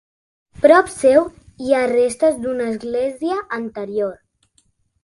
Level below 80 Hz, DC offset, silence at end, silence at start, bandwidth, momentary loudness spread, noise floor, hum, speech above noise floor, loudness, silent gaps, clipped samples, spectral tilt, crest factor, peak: -54 dBFS; under 0.1%; 0.9 s; 0.6 s; 11.5 kHz; 13 LU; -62 dBFS; none; 45 dB; -18 LUFS; none; under 0.1%; -4.5 dB/octave; 18 dB; 0 dBFS